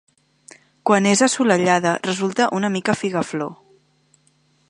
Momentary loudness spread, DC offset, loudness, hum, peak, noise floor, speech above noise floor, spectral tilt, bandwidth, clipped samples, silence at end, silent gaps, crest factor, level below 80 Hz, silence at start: 10 LU; under 0.1%; -19 LUFS; none; -2 dBFS; -61 dBFS; 42 dB; -4 dB/octave; 11.5 kHz; under 0.1%; 1.15 s; none; 20 dB; -64 dBFS; 0.85 s